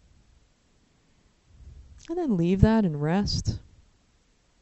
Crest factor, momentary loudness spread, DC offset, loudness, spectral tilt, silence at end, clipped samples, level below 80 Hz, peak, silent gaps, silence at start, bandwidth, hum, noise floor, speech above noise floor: 26 dB; 13 LU; under 0.1%; -25 LUFS; -7 dB/octave; 1 s; under 0.1%; -40 dBFS; -2 dBFS; none; 1.6 s; 8.2 kHz; none; -64 dBFS; 41 dB